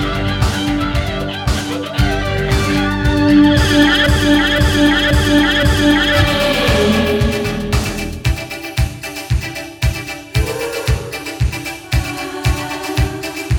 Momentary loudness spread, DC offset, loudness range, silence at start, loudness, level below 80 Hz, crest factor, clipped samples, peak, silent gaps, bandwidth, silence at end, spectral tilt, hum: 10 LU; under 0.1%; 8 LU; 0 s; -15 LUFS; -22 dBFS; 14 dB; under 0.1%; 0 dBFS; none; 18.5 kHz; 0 s; -5 dB/octave; none